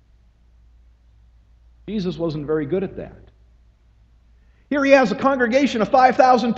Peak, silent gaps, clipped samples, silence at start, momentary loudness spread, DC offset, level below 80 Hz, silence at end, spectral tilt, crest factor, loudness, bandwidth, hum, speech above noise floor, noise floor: 0 dBFS; none; under 0.1%; 1.85 s; 15 LU; under 0.1%; -50 dBFS; 0 s; -6 dB/octave; 20 dB; -18 LUFS; 7.8 kHz; none; 36 dB; -54 dBFS